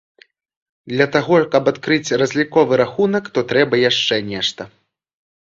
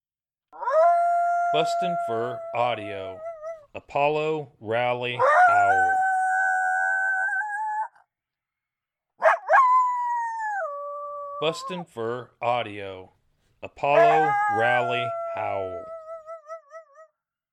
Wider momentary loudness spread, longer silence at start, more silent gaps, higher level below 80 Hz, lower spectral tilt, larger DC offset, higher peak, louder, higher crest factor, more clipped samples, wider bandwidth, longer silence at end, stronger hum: second, 7 LU vs 19 LU; first, 0.85 s vs 0.55 s; neither; first, -56 dBFS vs -72 dBFS; about the same, -4.5 dB/octave vs -4.5 dB/octave; neither; first, 0 dBFS vs -6 dBFS; first, -17 LUFS vs -23 LUFS; about the same, 18 dB vs 18 dB; neither; second, 7.8 kHz vs 11 kHz; first, 0.75 s vs 0.5 s; neither